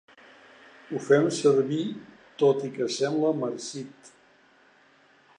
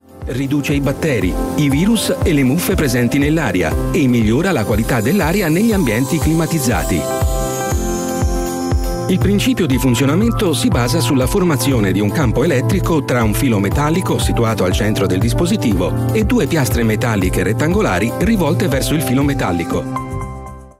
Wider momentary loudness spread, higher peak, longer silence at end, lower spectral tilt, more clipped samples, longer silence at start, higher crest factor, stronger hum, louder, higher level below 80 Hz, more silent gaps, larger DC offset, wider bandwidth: first, 17 LU vs 5 LU; about the same, -8 dBFS vs -6 dBFS; first, 1.3 s vs 0.1 s; about the same, -5.5 dB/octave vs -5.5 dB/octave; neither; first, 0.9 s vs 0.1 s; first, 20 dB vs 10 dB; neither; second, -26 LUFS vs -16 LUFS; second, -78 dBFS vs -26 dBFS; neither; neither; second, 10.5 kHz vs 16.5 kHz